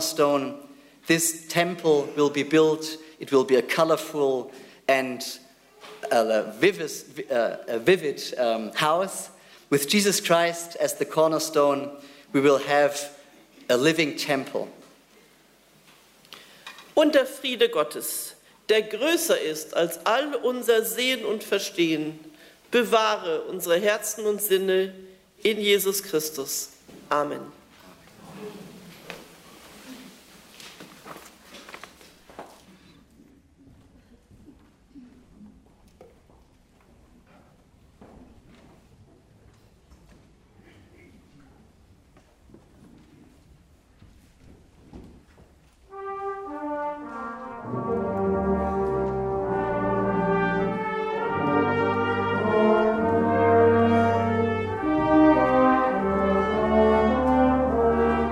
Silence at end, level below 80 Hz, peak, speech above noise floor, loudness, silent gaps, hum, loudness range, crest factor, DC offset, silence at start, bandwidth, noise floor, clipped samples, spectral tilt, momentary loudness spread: 0 s; -50 dBFS; -6 dBFS; 34 dB; -24 LUFS; none; none; 16 LU; 18 dB; under 0.1%; 0 s; 16 kHz; -57 dBFS; under 0.1%; -4 dB/octave; 21 LU